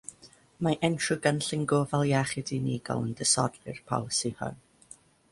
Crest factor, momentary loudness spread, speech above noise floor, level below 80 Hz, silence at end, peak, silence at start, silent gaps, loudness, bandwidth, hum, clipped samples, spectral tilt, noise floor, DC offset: 22 dB; 9 LU; 28 dB; -62 dBFS; 0.75 s; -8 dBFS; 0.1 s; none; -29 LUFS; 11.5 kHz; none; under 0.1%; -4 dB/octave; -56 dBFS; under 0.1%